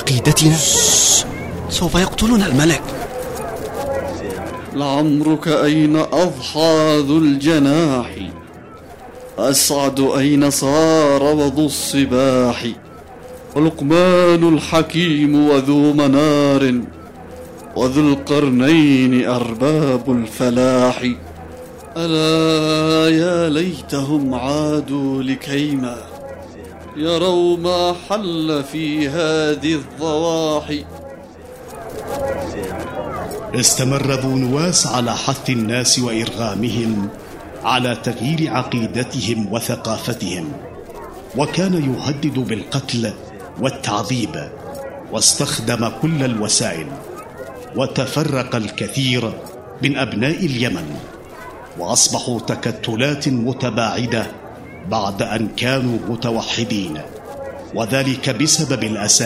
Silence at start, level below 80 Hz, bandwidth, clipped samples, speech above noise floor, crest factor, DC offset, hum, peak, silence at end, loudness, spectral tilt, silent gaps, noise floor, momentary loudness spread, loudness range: 0 s; -42 dBFS; 16 kHz; under 0.1%; 21 dB; 18 dB; under 0.1%; none; 0 dBFS; 0 s; -17 LUFS; -4 dB/octave; none; -37 dBFS; 18 LU; 7 LU